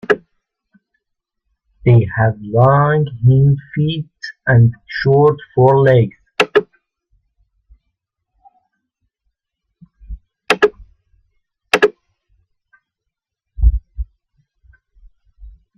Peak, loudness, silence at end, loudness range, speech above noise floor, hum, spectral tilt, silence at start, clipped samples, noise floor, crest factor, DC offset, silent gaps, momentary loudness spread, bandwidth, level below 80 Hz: 0 dBFS; -15 LUFS; 0.3 s; 10 LU; 67 dB; none; -7.5 dB/octave; 0.1 s; under 0.1%; -79 dBFS; 18 dB; under 0.1%; none; 12 LU; 11 kHz; -30 dBFS